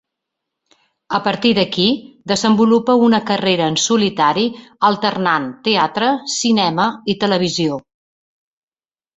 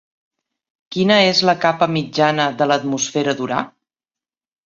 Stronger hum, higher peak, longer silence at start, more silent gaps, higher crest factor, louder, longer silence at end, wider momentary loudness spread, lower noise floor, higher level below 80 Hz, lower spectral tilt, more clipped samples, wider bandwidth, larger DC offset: neither; about the same, -2 dBFS vs -2 dBFS; first, 1.1 s vs 0.9 s; neither; about the same, 16 dB vs 18 dB; about the same, -16 LUFS vs -17 LUFS; first, 1.35 s vs 1 s; second, 7 LU vs 10 LU; about the same, under -90 dBFS vs under -90 dBFS; about the same, -58 dBFS vs -62 dBFS; about the same, -4 dB/octave vs -4 dB/octave; neither; about the same, 8.2 kHz vs 7.8 kHz; neither